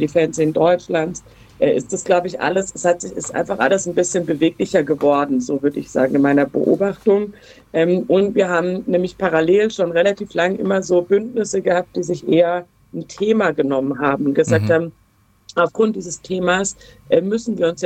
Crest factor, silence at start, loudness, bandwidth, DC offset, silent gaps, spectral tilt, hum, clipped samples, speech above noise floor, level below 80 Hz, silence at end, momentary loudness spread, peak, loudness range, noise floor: 16 dB; 0 s; -18 LUFS; 9.4 kHz; under 0.1%; none; -5.5 dB/octave; none; under 0.1%; 29 dB; -54 dBFS; 0 s; 7 LU; -2 dBFS; 2 LU; -47 dBFS